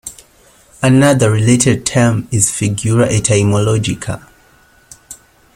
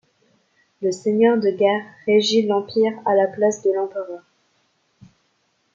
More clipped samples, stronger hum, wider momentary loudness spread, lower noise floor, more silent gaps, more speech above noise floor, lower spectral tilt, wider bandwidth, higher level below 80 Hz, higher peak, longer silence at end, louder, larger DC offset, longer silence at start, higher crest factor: neither; neither; first, 15 LU vs 10 LU; second, -49 dBFS vs -67 dBFS; neither; second, 36 dB vs 48 dB; about the same, -5 dB/octave vs -4.5 dB/octave; first, 16 kHz vs 7.8 kHz; first, -42 dBFS vs -72 dBFS; first, 0 dBFS vs -4 dBFS; second, 0.4 s vs 1.55 s; first, -13 LUFS vs -20 LUFS; neither; second, 0.05 s vs 0.8 s; about the same, 14 dB vs 16 dB